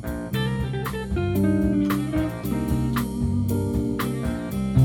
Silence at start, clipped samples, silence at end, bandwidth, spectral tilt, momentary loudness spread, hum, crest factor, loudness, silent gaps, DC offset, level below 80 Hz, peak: 0 s; under 0.1%; 0 s; 19.5 kHz; -7.5 dB/octave; 6 LU; none; 16 dB; -25 LUFS; none; under 0.1%; -34 dBFS; -8 dBFS